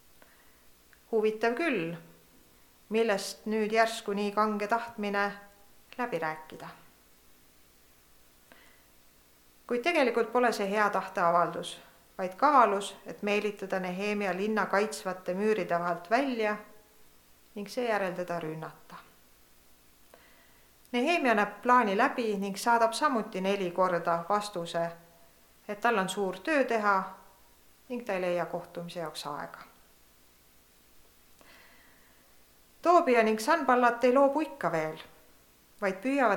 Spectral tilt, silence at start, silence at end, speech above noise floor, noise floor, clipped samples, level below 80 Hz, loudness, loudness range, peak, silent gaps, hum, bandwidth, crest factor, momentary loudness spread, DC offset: -4.5 dB/octave; 1.1 s; 0 s; 32 dB; -61 dBFS; under 0.1%; -70 dBFS; -29 LUFS; 11 LU; -8 dBFS; none; none; 19 kHz; 22 dB; 16 LU; under 0.1%